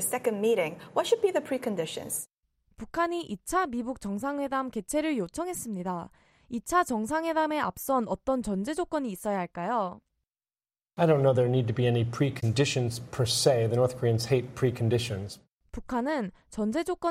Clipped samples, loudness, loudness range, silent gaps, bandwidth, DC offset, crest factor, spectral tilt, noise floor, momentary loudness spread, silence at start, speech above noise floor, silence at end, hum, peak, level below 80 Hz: under 0.1%; -29 LUFS; 5 LU; 2.33-2.37 s, 10.27-10.31 s; 16 kHz; under 0.1%; 18 dB; -5.5 dB/octave; under -90 dBFS; 10 LU; 0 s; over 62 dB; 0 s; none; -10 dBFS; -56 dBFS